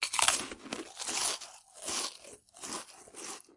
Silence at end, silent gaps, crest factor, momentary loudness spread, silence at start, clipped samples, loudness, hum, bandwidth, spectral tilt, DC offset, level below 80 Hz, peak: 0.15 s; none; 30 dB; 20 LU; 0 s; under 0.1%; -34 LUFS; none; 11.5 kHz; 0.5 dB/octave; under 0.1%; -70 dBFS; -6 dBFS